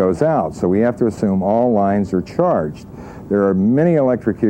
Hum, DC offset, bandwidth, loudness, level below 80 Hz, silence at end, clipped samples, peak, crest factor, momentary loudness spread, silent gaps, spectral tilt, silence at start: none; under 0.1%; 9.4 kHz; -17 LUFS; -46 dBFS; 0 s; under 0.1%; -2 dBFS; 14 dB; 7 LU; none; -9 dB/octave; 0 s